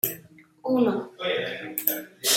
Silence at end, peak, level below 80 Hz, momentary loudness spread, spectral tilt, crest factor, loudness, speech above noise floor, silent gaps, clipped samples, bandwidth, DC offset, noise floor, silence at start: 0 s; 0 dBFS; -72 dBFS; 8 LU; -2.5 dB/octave; 26 dB; -27 LUFS; 24 dB; none; under 0.1%; 17 kHz; under 0.1%; -50 dBFS; 0.05 s